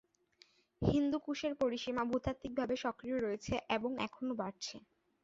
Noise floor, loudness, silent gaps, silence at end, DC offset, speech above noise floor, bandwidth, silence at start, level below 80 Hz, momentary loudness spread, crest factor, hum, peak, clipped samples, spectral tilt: -69 dBFS; -37 LUFS; none; 0.45 s; under 0.1%; 32 dB; 7.6 kHz; 0.8 s; -56 dBFS; 6 LU; 20 dB; none; -18 dBFS; under 0.1%; -5 dB/octave